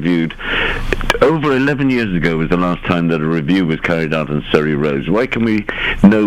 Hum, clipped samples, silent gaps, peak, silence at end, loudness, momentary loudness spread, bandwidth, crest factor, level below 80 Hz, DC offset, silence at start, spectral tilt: none; 0.1%; none; 0 dBFS; 0 s; -15 LUFS; 5 LU; 15 kHz; 14 dB; -28 dBFS; under 0.1%; 0 s; -7 dB/octave